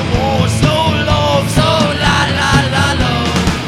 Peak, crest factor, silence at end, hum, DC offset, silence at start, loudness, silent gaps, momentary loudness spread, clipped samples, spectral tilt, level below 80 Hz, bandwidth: 0 dBFS; 12 dB; 0 s; none; under 0.1%; 0 s; -12 LUFS; none; 2 LU; under 0.1%; -5 dB/octave; -26 dBFS; 15.5 kHz